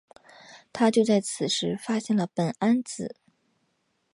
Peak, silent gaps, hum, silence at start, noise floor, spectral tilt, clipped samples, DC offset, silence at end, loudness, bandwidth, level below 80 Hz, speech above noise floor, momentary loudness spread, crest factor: -10 dBFS; none; none; 0.5 s; -73 dBFS; -5 dB/octave; under 0.1%; under 0.1%; 1.05 s; -26 LUFS; 11.5 kHz; -70 dBFS; 48 dB; 13 LU; 18 dB